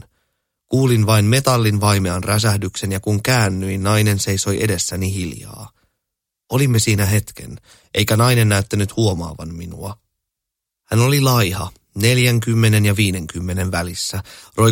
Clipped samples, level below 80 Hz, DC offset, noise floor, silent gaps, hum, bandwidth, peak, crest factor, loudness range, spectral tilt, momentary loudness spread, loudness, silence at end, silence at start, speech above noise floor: under 0.1%; -44 dBFS; under 0.1%; -82 dBFS; none; none; 17 kHz; 0 dBFS; 18 dB; 4 LU; -5 dB/octave; 15 LU; -17 LUFS; 0 s; 0.7 s; 65 dB